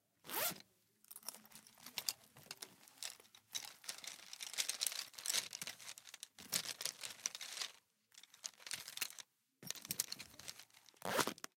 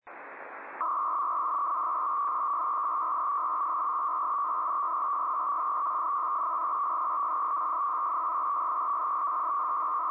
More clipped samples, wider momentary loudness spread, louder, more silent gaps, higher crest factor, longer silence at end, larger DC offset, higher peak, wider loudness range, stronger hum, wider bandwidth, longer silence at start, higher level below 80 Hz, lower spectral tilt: neither; first, 18 LU vs 0 LU; second, -44 LUFS vs -29 LUFS; neither; first, 36 dB vs 8 dB; about the same, 0.1 s vs 0 s; neither; first, -12 dBFS vs -22 dBFS; first, 6 LU vs 0 LU; neither; first, 17 kHz vs 3.7 kHz; first, 0.25 s vs 0.05 s; about the same, -88 dBFS vs under -90 dBFS; second, 0 dB/octave vs -5.5 dB/octave